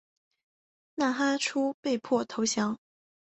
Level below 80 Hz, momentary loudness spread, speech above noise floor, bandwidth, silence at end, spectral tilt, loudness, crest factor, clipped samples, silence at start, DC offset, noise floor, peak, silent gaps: -74 dBFS; 6 LU; over 62 dB; 8.4 kHz; 0.55 s; -3 dB/octave; -29 LUFS; 18 dB; under 0.1%; 0.95 s; under 0.1%; under -90 dBFS; -14 dBFS; 1.74-1.83 s